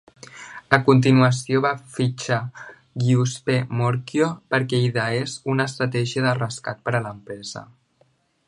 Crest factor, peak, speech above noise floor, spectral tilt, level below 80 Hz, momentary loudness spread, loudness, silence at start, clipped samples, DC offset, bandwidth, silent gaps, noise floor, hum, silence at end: 22 dB; 0 dBFS; 42 dB; -6 dB/octave; -60 dBFS; 18 LU; -21 LUFS; 0.35 s; under 0.1%; under 0.1%; 11 kHz; none; -63 dBFS; none; 0.85 s